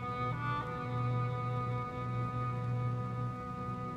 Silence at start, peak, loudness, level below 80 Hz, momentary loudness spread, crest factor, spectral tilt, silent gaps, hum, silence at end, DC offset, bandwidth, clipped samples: 0 s; -24 dBFS; -37 LUFS; -56 dBFS; 4 LU; 12 dB; -8.5 dB/octave; none; none; 0 s; under 0.1%; 6.2 kHz; under 0.1%